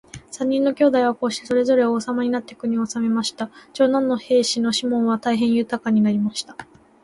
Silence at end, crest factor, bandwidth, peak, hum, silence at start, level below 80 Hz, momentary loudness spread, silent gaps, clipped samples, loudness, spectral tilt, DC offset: 0.4 s; 16 dB; 11.5 kHz; -6 dBFS; none; 0.15 s; -60 dBFS; 9 LU; none; under 0.1%; -20 LUFS; -4.5 dB/octave; under 0.1%